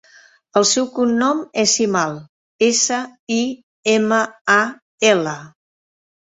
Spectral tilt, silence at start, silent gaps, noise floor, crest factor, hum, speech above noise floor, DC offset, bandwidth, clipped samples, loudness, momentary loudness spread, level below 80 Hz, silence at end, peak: -2.5 dB/octave; 0.55 s; 2.29-2.59 s, 3.19-3.27 s, 3.63-3.83 s, 4.41-4.45 s, 4.82-4.98 s; -50 dBFS; 18 dB; none; 32 dB; under 0.1%; 8.4 kHz; under 0.1%; -18 LUFS; 9 LU; -64 dBFS; 0.75 s; -2 dBFS